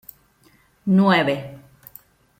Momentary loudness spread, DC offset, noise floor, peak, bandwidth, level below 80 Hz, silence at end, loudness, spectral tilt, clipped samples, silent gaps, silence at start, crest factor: 16 LU; under 0.1%; -58 dBFS; -4 dBFS; 16 kHz; -62 dBFS; 0.85 s; -19 LUFS; -7.5 dB/octave; under 0.1%; none; 0.85 s; 18 dB